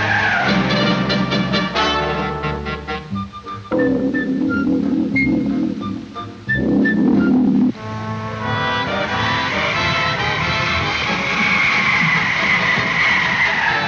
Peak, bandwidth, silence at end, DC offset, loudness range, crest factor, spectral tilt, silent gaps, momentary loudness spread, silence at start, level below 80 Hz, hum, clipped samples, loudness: -4 dBFS; 7.6 kHz; 0 s; under 0.1%; 5 LU; 14 dB; -5.5 dB/octave; none; 11 LU; 0 s; -42 dBFS; none; under 0.1%; -17 LUFS